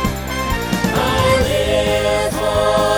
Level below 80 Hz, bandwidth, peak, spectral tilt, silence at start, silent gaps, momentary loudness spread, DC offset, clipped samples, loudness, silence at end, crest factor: -28 dBFS; over 20 kHz; -2 dBFS; -4.5 dB/octave; 0 s; none; 6 LU; under 0.1%; under 0.1%; -17 LUFS; 0 s; 14 dB